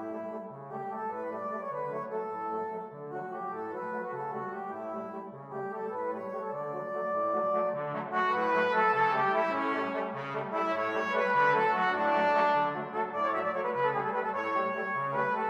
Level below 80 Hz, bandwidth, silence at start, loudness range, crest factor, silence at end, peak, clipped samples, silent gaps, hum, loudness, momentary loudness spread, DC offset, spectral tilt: -82 dBFS; 9.4 kHz; 0 s; 9 LU; 18 dB; 0 s; -14 dBFS; under 0.1%; none; none; -31 LUFS; 12 LU; under 0.1%; -6 dB/octave